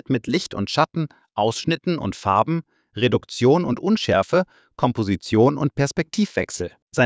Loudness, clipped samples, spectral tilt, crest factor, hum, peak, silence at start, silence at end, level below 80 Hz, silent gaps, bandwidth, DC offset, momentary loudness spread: -22 LUFS; under 0.1%; -6 dB/octave; 18 dB; none; -4 dBFS; 0.1 s; 0 s; -48 dBFS; 6.82-6.87 s; 8 kHz; under 0.1%; 10 LU